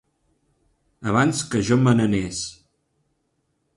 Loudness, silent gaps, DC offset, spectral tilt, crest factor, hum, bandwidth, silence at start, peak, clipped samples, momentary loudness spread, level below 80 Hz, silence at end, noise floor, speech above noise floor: -21 LUFS; none; under 0.1%; -5.5 dB/octave; 18 dB; none; 11.5 kHz; 1 s; -6 dBFS; under 0.1%; 13 LU; -50 dBFS; 1.25 s; -72 dBFS; 51 dB